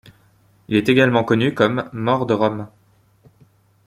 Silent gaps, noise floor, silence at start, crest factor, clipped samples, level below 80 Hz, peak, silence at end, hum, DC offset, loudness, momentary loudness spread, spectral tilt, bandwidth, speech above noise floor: none; -56 dBFS; 0.7 s; 20 dB; under 0.1%; -56 dBFS; 0 dBFS; 1.2 s; none; under 0.1%; -18 LUFS; 8 LU; -7 dB/octave; 15.5 kHz; 38 dB